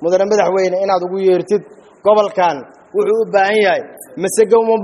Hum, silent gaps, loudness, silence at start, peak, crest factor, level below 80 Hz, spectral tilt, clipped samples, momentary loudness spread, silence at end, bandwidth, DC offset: none; none; -15 LUFS; 0 s; 0 dBFS; 14 dB; -62 dBFS; -4.5 dB/octave; under 0.1%; 8 LU; 0 s; 12 kHz; under 0.1%